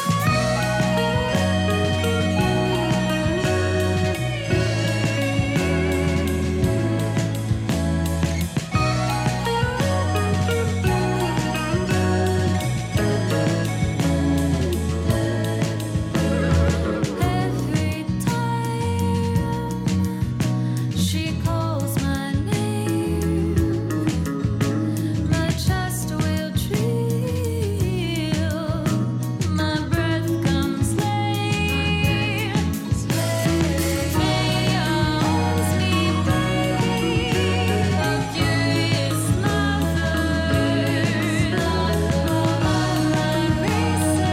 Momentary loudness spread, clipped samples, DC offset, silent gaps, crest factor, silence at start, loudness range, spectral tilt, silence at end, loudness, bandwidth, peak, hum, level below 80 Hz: 3 LU; under 0.1%; under 0.1%; none; 14 dB; 0 s; 2 LU; -5.5 dB/octave; 0 s; -22 LUFS; 16.5 kHz; -6 dBFS; none; -34 dBFS